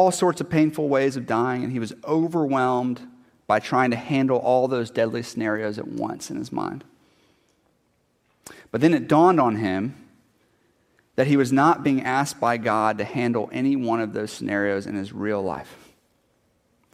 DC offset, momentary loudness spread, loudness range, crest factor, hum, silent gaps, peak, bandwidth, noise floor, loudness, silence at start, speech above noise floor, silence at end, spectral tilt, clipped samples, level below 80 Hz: under 0.1%; 12 LU; 7 LU; 18 dB; none; none; -4 dBFS; 15 kHz; -67 dBFS; -23 LUFS; 0 s; 45 dB; 1.2 s; -6 dB/octave; under 0.1%; -64 dBFS